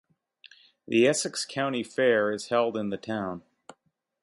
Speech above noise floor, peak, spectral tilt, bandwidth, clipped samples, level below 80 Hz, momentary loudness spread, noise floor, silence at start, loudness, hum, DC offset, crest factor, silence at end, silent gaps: 45 dB; -10 dBFS; -4 dB/octave; 11.5 kHz; under 0.1%; -70 dBFS; 10 LU; -71 dBFS; 0.9 s; -27 LUFS; none; under 0.1%; 18 dB; 0.85 s; none